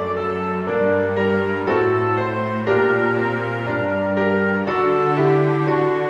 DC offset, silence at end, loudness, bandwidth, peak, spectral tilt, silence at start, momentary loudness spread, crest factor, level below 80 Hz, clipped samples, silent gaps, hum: under 0.1%; 0 s; -19 LUFS; 7.4 kHz; -6 dBFS; -8.5 dB/octave; 0 s; 6 LU; 14 dB; -56 dBFS; under 0.1%; none; none